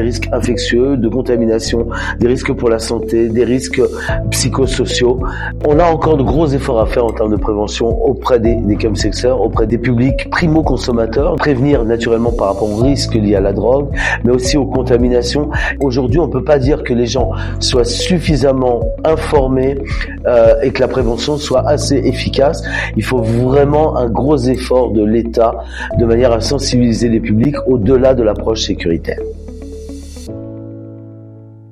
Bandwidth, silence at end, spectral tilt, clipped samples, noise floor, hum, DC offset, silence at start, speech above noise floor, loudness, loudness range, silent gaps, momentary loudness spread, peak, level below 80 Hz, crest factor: 14 kHz; 0.05 s; -6 dB/octave; under 0.1%; -35 dBFS; none; under 0.1%; 0 s; 22 dB; -13 LUFS; 2 LU; none; 7 LU; 0 dBFS; -24 dBFS; 12 dB